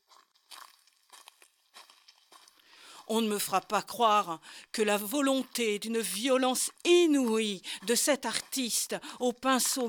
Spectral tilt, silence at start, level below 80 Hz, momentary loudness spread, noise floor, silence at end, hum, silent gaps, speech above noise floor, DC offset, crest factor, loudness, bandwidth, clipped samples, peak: -2.5 dB/octave; 0.5 s; -78 dBFS; 11 LU; -63 dBFS; 0 s; none; none; 34 dB; under 0.1%; 20 dB; -29 LUFS; over 20 kHz; under 0.1%; -10 dBFS